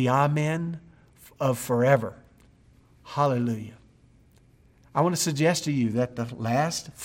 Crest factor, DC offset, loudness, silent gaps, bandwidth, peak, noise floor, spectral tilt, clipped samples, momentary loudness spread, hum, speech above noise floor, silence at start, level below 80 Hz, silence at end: 20 dB; under 0.1%; -26 LUFS; none; 16.5 kHz; -6 dBFS; -58 dBFS; -5.5 dB/octave; under 0.1%; 13 LU; none; 33 dB; 0 s; -62 dBFS; 0 s